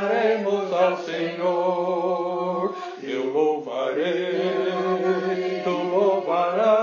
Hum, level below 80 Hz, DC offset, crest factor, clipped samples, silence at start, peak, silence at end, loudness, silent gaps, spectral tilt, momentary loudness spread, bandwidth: none; under -90 dBFS; under 0.1%; 14 dB; under 0.1%; 0 s; -8 dBFS; 0 s; -23 LUFS; none; -6 dB/octave; 6 LU; 7.2 kHz